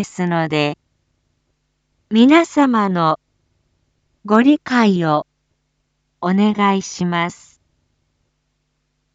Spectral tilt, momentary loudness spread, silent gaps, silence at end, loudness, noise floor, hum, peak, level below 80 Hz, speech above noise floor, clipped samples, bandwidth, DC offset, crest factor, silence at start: -6 dB/octave; 11 LU; none; 1.8 s; -16 LUFS; -69 dBFS; none; 0 dBFS; -64 dBFS; 54 dB; under 0.1%; 8 kHz; under 0.1%; 18 dB; 0 s